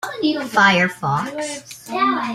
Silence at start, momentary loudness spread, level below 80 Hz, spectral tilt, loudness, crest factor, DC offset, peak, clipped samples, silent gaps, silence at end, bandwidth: 0 s; 14 LU; -60 dBFS; -4 dB/octave; -18 LUFS; 18 dB; under 0.1%; -2 dBFS; under 0.1%; none; 0 s; 15.5 kHz